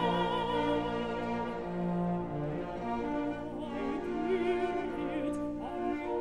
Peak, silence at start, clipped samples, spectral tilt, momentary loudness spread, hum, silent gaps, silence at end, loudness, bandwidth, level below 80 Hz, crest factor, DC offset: -20 dBFS; 0 s; under 0.1%; -7.5 dB/octave; 6 LU; none; none; 0 s; -34 LUFS; 11 kHz; -54 dBFS; 14 dB; 0.2%